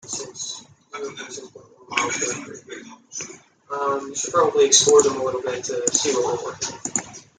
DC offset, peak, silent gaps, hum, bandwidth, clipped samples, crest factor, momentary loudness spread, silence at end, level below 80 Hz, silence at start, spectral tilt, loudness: under 0.1%; -2 dBFS; none; none; 10 kHz; under 0.1%; 22 dB; 22 LU; 0.15 s; -66 dBFS; 0.05 s; -1.5 dB/octave; -21 LUFS